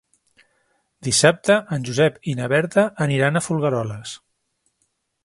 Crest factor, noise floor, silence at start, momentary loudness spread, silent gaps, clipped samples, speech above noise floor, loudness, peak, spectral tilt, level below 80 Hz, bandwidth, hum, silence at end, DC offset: 22 dB; -71 dBFS; 1 s; 15 LU; none; under 0.1%; 51 dB; -20 LUFS; 0 dBFS; -4.5 dB/octave; -58 dBFS; 11.5 kHz; none; 1.1 s; under 0.1%